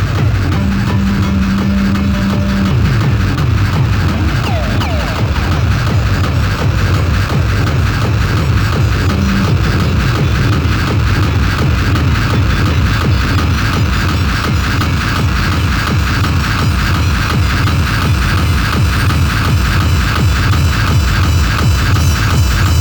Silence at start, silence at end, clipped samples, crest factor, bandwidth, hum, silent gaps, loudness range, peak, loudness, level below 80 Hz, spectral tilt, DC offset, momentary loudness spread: 0 s; 0 s; under 0.1%; 12 dB; over 20 kHz; none; none; 1 LU; 0 dBFS; -13 LUFS; -18 dBFS; -5.5 dB/octave; under 0.1%; 2 LU